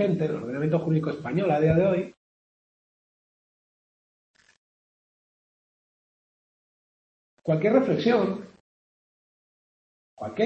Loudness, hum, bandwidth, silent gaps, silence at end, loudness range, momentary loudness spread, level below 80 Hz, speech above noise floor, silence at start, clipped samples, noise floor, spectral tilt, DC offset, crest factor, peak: -25 LUFS; none; 7.2 kHz; 2.17-4.34 s, 4.58-7.37 s, 8.60-10.17 s; 0 s; 7 LU; 14 LU; -60 dBFS; over 67 dB; 0 s; under 0.1%; under -90 dBFS; -8.5 dB/octave; under 0.1%; 20 dB; -8 dBFS